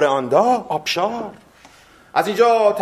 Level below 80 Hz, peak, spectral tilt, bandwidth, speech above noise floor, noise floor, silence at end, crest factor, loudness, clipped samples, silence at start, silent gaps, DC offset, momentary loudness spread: -62 dBFS; -2 dBFS; -4 dB/octave; 15.5 kHz; 30 dB; -48 dBFS; 0 s; 16 dB; -18 LUFS; under 0.1%; 0 s; none; under 0.1%; 10 LU